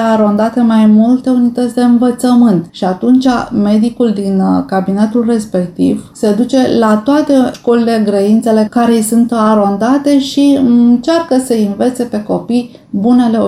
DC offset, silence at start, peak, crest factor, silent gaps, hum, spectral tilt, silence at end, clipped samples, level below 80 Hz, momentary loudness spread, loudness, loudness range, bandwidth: under 0.1%; 0 s; 0 dBFS; 8 dB; none; none; -6.5 dB/octave; 0 s; under 0.1%; -48 dBFS; 6 LU; -11 LUFS; 2 LU; 15 kHz